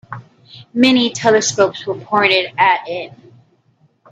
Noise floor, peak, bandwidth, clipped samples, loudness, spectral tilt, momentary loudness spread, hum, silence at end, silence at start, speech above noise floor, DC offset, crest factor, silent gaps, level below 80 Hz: -57 dBFS; 0 dBFS; 9.2 kHz; under 0.1%; -15 LUFS; -3 dB/octave; 16 LU; none; 0.95 s; 0.1 s; 42 dB; under 0.1%; 16 dB; none; -62 dBFS